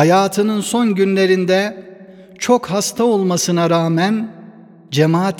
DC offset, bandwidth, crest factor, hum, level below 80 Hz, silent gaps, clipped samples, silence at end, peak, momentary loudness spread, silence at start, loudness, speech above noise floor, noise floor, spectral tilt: under 0.1%; 18.5 kHz; 16 dB; none; -62 dBFS; none; under 0.1%; 0 s; 0 dBFS; 9 LU; 0 s; -16 LUFS; 25 dB; -40 dBFS; -5 dB/octave